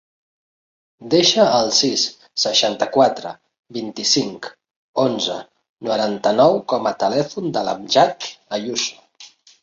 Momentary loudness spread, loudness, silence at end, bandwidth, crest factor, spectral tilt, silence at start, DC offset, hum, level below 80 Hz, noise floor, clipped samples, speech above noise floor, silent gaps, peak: 15 LU; -18 LUFS; 0.35 s; 7.8 kHz; 18 dB; -3 dB/octave; 1 s; under 0.1%; none; -64 dBFS; -46 dBFS; under 0.1%; 28 dB; 3.59-3.63 s, 4.76-4.94 s, 5.69-5.77 s; -2 dBFS